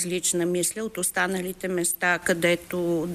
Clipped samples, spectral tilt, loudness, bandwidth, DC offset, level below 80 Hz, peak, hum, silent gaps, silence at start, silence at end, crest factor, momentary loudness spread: under 0.1%; -3.5 dB/octave; -25 LUFS; 15.5 kHz; under 0.1%; -58 dBFS; -8 dBFS; none; none; 0 s; 0 s; 18 dB; 4 LU